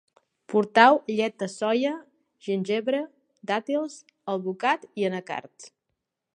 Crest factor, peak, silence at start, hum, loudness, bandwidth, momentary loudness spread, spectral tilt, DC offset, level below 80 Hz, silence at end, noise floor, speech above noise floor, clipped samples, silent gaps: 24 dB; -2 dBFS; 0.5 s; none; -25 LUFS; 10.5 kHz; 19 LU; -5 dB/octave; under 0.1%; -80 dBFS; 0.7 s; -82 dBFS; 57 dB; under 0.1%; none